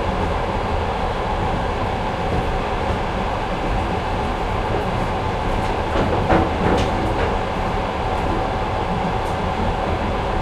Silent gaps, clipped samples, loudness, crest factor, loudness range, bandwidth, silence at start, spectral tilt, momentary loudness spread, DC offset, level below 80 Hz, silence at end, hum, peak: none; under 0.1%; -22 LUFS; 18 dB; 2 LU; 12.5 kHz; 0 s; -6.5 dB/octave; 4 LU; under 0.1%; -28 dBFS; 0 s; none; -2 dBFS